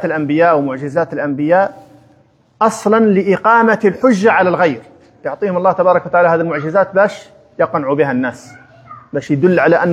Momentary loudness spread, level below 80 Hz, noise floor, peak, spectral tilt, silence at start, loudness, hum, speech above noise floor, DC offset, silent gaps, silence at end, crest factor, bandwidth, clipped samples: 9 LU; -60 dBFS; -51 dBFS; 0 dBFS; -7 dB/octave; 0 s; -14 LUFS; none; 38 dB; under 0.1%; none; 0 s; 14 dB; 12 kHz; under 0.1%